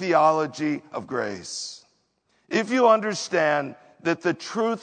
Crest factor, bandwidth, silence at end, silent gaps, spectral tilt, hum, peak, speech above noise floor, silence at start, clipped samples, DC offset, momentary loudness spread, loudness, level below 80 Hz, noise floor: 20 dB; 9.4 kHz; 0 s; none; -4.5 dB/octave; none; -4 dBFS; 45 dB; 0 s; under 0.1%; under 0.1%; 13 LU; -24 LUFS; -76 dBFS; -68 dBFS